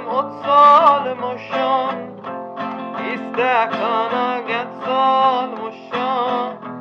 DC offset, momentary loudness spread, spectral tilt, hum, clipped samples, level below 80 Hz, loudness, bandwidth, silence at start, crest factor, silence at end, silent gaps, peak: under 0.1%; 15 LU; -5.5 dB/octave; none; under 0.1%; -76 dBFS; -18 LUFS; 7 kHz; 0 s; 18 dB; 0 s; none; 0 dBFS